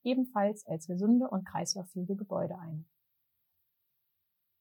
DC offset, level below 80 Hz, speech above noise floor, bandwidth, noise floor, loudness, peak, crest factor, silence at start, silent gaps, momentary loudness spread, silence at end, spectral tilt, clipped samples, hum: under 0.1%; -78 dBFS; 49 dB; 19 kHz; -81 dBFS; -33 LUFS; -18 dBFS; 16 dB; 0.05 s; none; 13 LU; 1.75 s; -5.5 dB/octave; under 0.1%; none